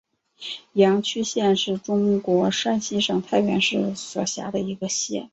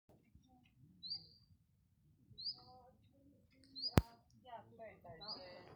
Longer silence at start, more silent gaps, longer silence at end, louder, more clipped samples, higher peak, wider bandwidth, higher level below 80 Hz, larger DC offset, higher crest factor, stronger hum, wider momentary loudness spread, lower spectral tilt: second, 0.4 s vs 0.85 s; neither; about the same, 0.05 s vs 0 s; first, -22 LUFS vs -44 LUFS; neither; first, -4 dBFS vs -10 dBFS; second, 8.2 kHz vs 15 kHz; second, -62 dBFS vs -56 dBFS; neither; second, 18 dB vs 38 dB; neither; second, 8 LU vs 26 LU; second, -4 dB/octave vs -5.5 dB/octave